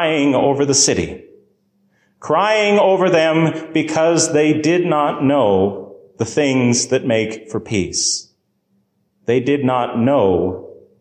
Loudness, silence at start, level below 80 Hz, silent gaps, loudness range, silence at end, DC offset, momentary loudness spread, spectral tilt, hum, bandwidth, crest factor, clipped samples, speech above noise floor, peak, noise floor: -16 LUFS; 0 s; -48 dBFS; none; 4 LU; 0.25 s; under 0.1%; 10 LU; -4 dB/octave; none; 10 kHz; 14 dB; under 0.1%; 48 dB; -4 dBFS; -64 dBFS